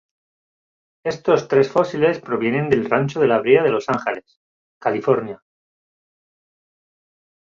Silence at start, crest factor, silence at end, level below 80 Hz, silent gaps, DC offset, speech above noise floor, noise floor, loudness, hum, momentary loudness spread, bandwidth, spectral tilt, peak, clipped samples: 1.05 s; 20 dB; 2.2 s; -60 dBFS; 4.36-4.81 s; under 0.1%; over 72 dB; under -90 dBFS; -19 LUFS; none; 12 LU; 7.4 kHz; -7 dB/octave; -2 dBFS; under 0.1%